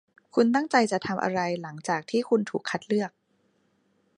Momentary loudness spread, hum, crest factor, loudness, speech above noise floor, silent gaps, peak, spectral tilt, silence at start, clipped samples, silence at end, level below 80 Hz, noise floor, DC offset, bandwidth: 8 LU; none; 20 dB; -27 LUFS; 43 dB; none; -6 dBFS; -5 dB/octave; 0.35 s; under 0.1%; 1.1 s; -72 dBFS; -69 dBFS; under 0.1%; 11 kHz